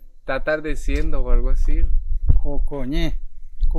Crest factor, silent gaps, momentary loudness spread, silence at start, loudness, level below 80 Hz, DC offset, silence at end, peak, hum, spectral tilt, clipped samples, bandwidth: 14 dB; none; 6 LU; 0.05 s; -25 LUFS; -18 dBFS; under 0.1%; 0 s; -2 dBFS; none; -7 dB/octave; under 0.1%; 6.4 kHz